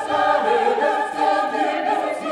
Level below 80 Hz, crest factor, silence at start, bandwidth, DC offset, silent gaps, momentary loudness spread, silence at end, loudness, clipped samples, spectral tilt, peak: -66 dBFS; 14 dB; 0 s; 11.5 kHz; under 0.1%; none; 4 LU; 0 s; -20 LUFS; under 0.1%; -3.5 dB/octave; -6 dBFS